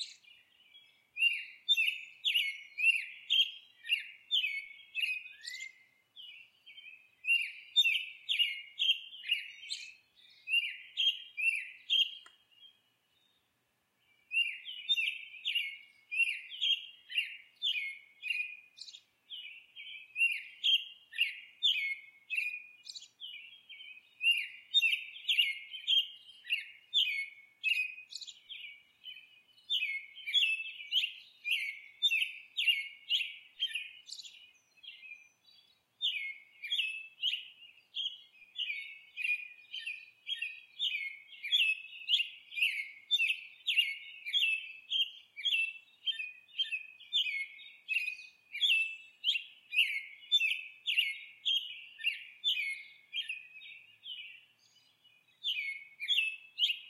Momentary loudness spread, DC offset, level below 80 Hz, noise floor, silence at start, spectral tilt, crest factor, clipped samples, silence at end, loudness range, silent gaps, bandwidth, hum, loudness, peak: 19 LU; under 0.1%; under -90 dBFS; -78 dBFS; 0 s; 5 dB/octave; 20 dB; under 0.1%; 0 s; 7 LU; none; 16 kHz; none; -32 LUFS; -16 dBFS